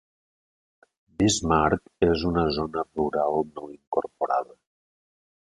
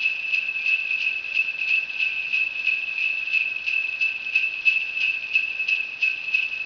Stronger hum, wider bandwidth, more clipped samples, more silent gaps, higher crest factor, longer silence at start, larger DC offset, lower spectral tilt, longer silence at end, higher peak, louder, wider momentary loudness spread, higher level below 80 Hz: neither; first, 11.5 kHz vs 5.4 kHz; neither; first, 3.87-3.92 s vs none; about the same, 22 dB vs 18 dB; first, 1.2 s vs 0 s; neither; first, -5 dB/octave vs 0.5 dB/octave; first, 1 s vs 0 s; about the same, -6 dBFS vs -8 dBFS; second, -25 LUFS vs -21 LUFS; first, 10 LU vs 3 LU; first, -46 dBFS vs -68 dBFS